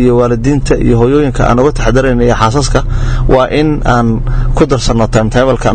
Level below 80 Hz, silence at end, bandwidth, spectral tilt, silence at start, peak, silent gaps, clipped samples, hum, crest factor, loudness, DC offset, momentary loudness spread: -16 dBFS; 0 s; 9.2 kHz; -6.5 dB/octave; 0 s; 0 dBFS; none; 0.7%; none; 8 dB; -10 LUFS; 0.5%; 4 LU